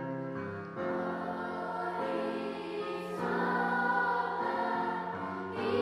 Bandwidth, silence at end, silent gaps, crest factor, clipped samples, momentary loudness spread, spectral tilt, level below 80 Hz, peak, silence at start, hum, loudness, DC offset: 13 kHz; 0 s; none; 16 dB; under 0.1%; 8 LU; -6.5 dB/octave; -74 dBFS; -18 dBFS; 0 s; none; -34 LUFS; under 0.1%